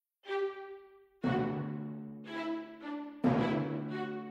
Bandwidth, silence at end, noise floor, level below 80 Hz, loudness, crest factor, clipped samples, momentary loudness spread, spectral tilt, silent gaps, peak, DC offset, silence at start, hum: 8 kHz; 0 s; -55 dBFS; -66 dBFS; -36 LUFS; 18 dB; under 0.1%; 12 LU; -8.5 dB/octave; none; -18 dBFS; under 0.1%; 0.25 s; none